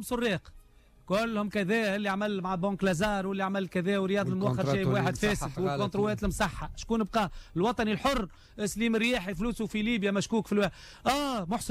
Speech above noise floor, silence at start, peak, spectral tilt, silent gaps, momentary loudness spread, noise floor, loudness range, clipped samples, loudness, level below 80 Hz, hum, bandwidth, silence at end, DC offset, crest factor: 28 dB; 0 s; -16 dBFS; -5.5 dB/octave; none; 5 LU; -57 dBFS; 1 LU; under 0.1%; -30 LUFS; -48 dBFS; none; 16 kHz; 0 s; under 0.1%; 14 dB